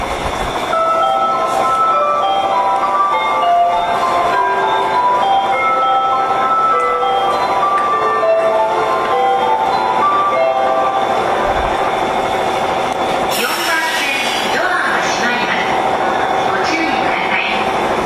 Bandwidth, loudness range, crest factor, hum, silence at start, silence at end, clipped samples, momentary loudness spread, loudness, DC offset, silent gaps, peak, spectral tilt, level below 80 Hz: 14 kHz; 2 LU; 12 dB; none; 0 s; 0 s; under 0.1%; 3 LU; -14 LUFS; under 0.1%; none; -4 dBFS; -3 dB/octave; -40 dBFS